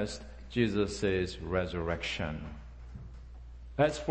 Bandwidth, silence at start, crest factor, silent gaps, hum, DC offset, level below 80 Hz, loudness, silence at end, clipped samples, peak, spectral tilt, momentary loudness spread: 8.8 kHz; 0 s; 20 dB; none; none; under 0.1%; -46 dBFS; -33 LUFS; 0 s; under 0.1%; -12 dBFS; -5.5 dB/octave; 19 LU